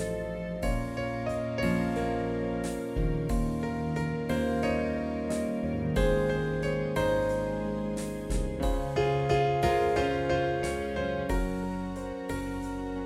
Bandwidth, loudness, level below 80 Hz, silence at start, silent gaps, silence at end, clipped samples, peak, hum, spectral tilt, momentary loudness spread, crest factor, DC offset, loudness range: 16 kHz; -30 LUFS; -38 dBFS; 0 s; none; 0 s; under 0.1%; -12 dBFS; none; -6.5 dB/octave; 8 LU; 16 dB; under 0.1%; 2 LU